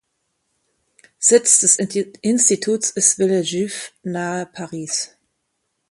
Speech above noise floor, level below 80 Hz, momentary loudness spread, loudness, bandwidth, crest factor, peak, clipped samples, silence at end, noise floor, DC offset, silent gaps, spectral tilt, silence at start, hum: 55 dB; -68 dBFS; 16 LU; -17 LUFS; 11.5 kHz; 20 dB; 0 dBFS; under 0.1%; 0.85 s; -73 dBFS; under 0.1%; none; -2.5 dB/octave; 1.2 s; none